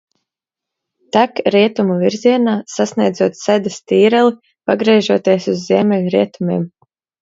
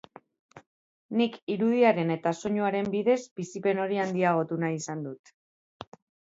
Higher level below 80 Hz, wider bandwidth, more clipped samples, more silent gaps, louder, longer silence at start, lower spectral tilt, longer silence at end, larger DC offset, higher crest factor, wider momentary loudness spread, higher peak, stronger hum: first, -62 dBFS vs -72 dBFS; about the same, 7.8 kHz vs 8 kHz; neither; second, none vs 0.67-1.09 s, 1.42-1.47 s, 3.31-3.36 s; first, -15 LUFS vs -27 LUFS; first, 1.15 s vs 0.55 s; about the same, -6 dB/octave vs -6 dB/octave; second, 0.55 s vs 1.15 s; neither; about the same, 16 dB vs 18 dB; second, 7 LU vs 20 LU; first, 0 dBFS vs -10 dBFS; neither